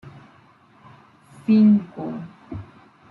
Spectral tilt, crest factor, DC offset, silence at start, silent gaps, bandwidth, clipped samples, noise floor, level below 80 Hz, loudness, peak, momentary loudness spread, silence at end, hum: -9.5 dB/octave; 16 dB; under 0.1%; 0.05 s; none; 4.6 kHz; under 0.1%; -53 dBFS; -60 dBFS; -19 LUFS; -8 dBFS; 22 LU; 0.5 s; none